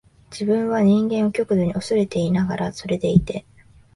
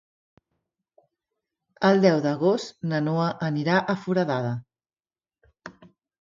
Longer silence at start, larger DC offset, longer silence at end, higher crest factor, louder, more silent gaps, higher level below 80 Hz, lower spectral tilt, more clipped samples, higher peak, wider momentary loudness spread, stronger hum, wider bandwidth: second, 0.3 s vs 1.8 s; neither; about the same, 0.55 s vs 0.5 s; about the same, 18 dB vs 20 dB; first, -21 LUFS vs -24 LUFS; neither; first, -44 dBFS vs -70 dBFS; about the same, -7.5 dB/octave vs -7 dB/octave; neither; first, -2 dBFS vs -6 dBFS; second, 10 LU vs 22 LU; neither; first, 11.5 kHz vs 7.6 kHz